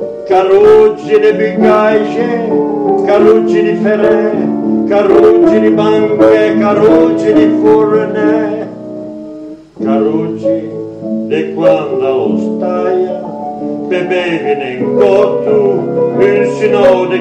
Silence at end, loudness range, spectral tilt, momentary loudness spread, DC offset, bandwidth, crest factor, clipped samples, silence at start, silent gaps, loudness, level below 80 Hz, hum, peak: 0 s; 6 LU; -7.5 dB/octave; 12 LU; under 0.1%; 8.2 kHz; 10 dB; 0.3%; 0 s; none; -10 LUFS; -48 dBFS; none; 0 dBFS